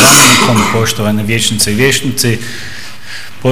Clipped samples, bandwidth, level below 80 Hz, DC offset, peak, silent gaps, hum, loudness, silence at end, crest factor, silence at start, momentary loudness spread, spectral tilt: 0.8%; over 20 kHz; -40 dBFS; 7%; 0 dBFS; none; none; -9 LUFS; 0 s; 12 dB; 0 s; 21 LU; -3 dB/octave